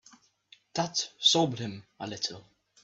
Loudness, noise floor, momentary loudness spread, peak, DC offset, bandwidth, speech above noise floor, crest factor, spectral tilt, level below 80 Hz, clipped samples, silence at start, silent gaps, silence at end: -28 LUFS; -61 dBFS; 17 LU; -10 dBFS; under 0.1%; 8.2 kHz; 31 dB; 22 dB; -3 dB/octave; -72 dBFS; under 0.1%; 0.75 s; none; 0.4 s